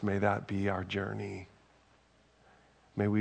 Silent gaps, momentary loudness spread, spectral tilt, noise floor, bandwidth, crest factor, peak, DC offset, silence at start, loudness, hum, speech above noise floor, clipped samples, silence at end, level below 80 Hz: none; 13 LU; -7.5 dB/octave; -66 dBFS; 8.8 kHz; 22 dB; -14 dBFS; under 0.1%; 0 s; -34 LUFS; none; 33 dB; under 0.1%; 0 s; -68 dBFS